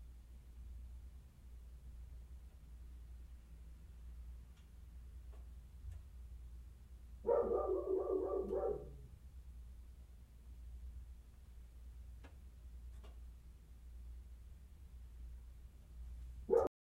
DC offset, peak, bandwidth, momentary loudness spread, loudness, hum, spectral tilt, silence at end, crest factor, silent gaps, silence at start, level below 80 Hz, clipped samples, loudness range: under 0.1%; -22 dBFS; 16 kHz; 22 LU; -43 LUFS; none; -8.5 dB/octave; 0.25 s; 24 dB; none; 0 s; -54 dBFS; under 0.1%; 17 LU